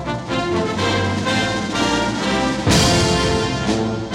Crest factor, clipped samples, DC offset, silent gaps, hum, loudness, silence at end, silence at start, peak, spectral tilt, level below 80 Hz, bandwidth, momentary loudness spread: 16 dB; under 0.1%; under 0.1%; none; none; -18 LUFS; 0 s; 0 s; -2 dBFS; -4.5 dB/octave; -34 dBFS; 16.5 kHz; 6 LU